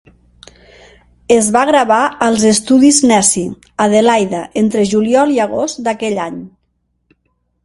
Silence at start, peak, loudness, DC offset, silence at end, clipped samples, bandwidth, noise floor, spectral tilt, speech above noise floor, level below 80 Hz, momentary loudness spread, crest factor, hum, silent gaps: 1.3 s; 0 dBFS; -12 LUFS; under 0.1%; 1.15 s; under 0.1%; 11.5 kHz; -64 dBFS; -3.5 dB/octave; 52 dB; -50 dBFS; 10 LU; 14 dB; none; none